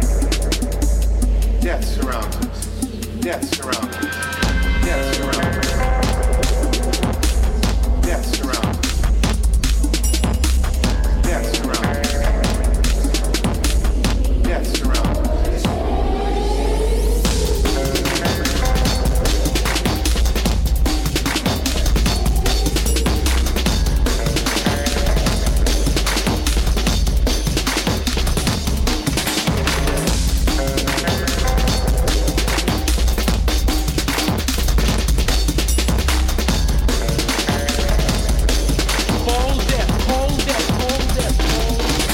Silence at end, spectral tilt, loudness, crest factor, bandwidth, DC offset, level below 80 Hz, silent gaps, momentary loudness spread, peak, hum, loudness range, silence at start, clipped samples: 0 s; -4.5 dB/octave; -19 LUFS; 12 dB; 17 kHz; under 0.1%; -18 dBFS; none; 2 LU; -6 dBFS; none; 1 LU; 0 s; under 0.1%